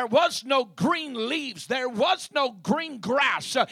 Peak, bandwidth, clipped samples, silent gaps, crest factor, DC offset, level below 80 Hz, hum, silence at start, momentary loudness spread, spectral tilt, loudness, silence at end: -8 dBFS; 15 kHz; under 0.1%; none; 18 dB; under 0.1%; -70 dBFS; none; 0 s; 6 LU; -3.5 dB/octave; -25 LUFS; 0 s